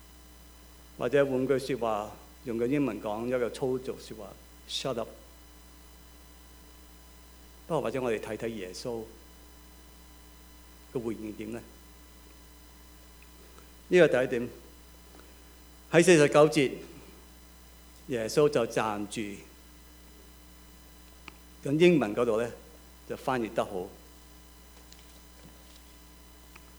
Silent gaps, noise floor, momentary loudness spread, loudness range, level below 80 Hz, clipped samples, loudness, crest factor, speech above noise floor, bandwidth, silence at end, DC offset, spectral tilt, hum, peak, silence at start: none; -52 dBFS; 29 LU; 15 LU; -56 dBFS; under 0.1%; -28 LUFS; 24 dB; 25 dB; over 20 kHz; 1.3 s; under 0.1%; -5.5 dB/octave; none; -8 dBFS; 1 s